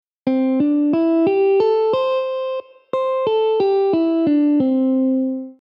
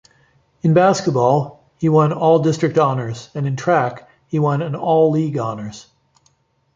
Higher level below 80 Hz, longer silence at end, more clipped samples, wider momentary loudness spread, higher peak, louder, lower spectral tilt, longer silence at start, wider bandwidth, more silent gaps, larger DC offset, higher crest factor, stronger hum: second, -66 dBFS vs -58 dBFS; second, 0.1 s vs 0.95 s; neither; second, 7 LU vs 11 LU; second, -6 dBFS vs -2 dBFS; about the same, -18 LUFS vs -17 LUFS; first, -8.5 dB/octave vs -7 dB/octave; second, 0.25 s vs 0.65 s; second, 5.6 kHz vs 7.8 kHz; neither; neither; second, 10 dB vs 16 dB; neither